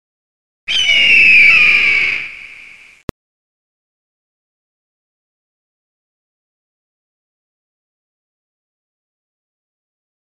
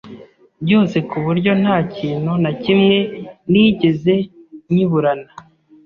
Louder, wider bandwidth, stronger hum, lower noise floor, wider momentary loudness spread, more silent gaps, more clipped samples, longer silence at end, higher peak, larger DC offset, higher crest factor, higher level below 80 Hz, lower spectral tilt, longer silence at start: first, -7 LUFS vs -16 LUFS; first, 13 kHz vs 6.8 kHz; neither; about the same, -40 dBFS vs -40 dBFS; first, 17 LU vs 10 LU; first, 3.03-3.08 s vs none; neither; first, 7.1 s vs 0.45 s; about the same, 0 dBFS vs -2 dBFS; neither; about the same, 18 dB vs 14 dB; about the same, -50 dBFS vs -52 dBFS; second, -0.5 dB/octave vs -8.5 dB/octave; first, 0.65 s vs 0.05 s